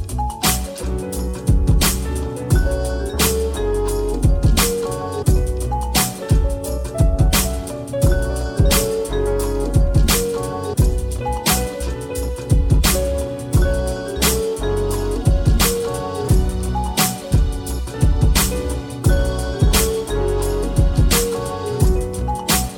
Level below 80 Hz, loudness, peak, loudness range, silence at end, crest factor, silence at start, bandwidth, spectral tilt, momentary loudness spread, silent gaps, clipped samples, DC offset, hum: -20 dBFS; -19 LUFS; 0 dBFS; 1 LU; 0 s; 16 dB; 0 s; 19 kHz; -4.5 dB/octave; 8 LU; none; under 0.1%; under 0.1%; none